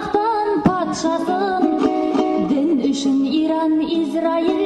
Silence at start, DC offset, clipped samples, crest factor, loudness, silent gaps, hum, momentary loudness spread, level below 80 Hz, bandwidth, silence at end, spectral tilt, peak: 0 s; under 0.1%; under 0.1%; 12 dB; -19 LUFS; none; none; 2 LU; -52 dBFS; 9.8 kHz; 0 s; -5.5 dB/octave; -6 dBFS